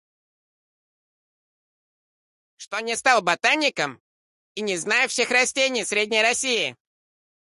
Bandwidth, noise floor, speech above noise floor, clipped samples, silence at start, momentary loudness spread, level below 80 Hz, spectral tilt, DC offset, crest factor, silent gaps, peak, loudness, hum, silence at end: 12 kHz; under -90 dBFS; over 68 dB; under 0.1%; 2.6 s; 10 LU; -72 dBFS; -1 dB/octave; under 0.1%; 22 dB; 2.67-2.71 s, 4.00-4.55 s; -4 dBFS; -21 LUFS; none; 0.75 s